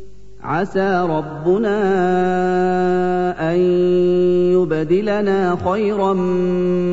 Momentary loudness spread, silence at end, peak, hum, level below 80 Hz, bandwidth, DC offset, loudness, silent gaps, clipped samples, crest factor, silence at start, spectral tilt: 4 LU; 0 s; -6 dBFS; none; -46 dBFS; 7.8 kHz; 2%; -17 LUFS; none; under 0.1%; 10 dB; 0 s; -8 dB/octave